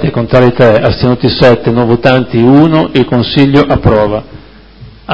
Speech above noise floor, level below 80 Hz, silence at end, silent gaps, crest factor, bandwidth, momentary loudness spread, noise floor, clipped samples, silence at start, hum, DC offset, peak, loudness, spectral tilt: 26 dB; -30 dBFS; 0 s; none; 8 dB; 8 kHz; 4 LU; -33 dBFS; 2%; 0 s; none; under 0.1%; 0 dBFS; -8 LUFS; -8.5 dB/octave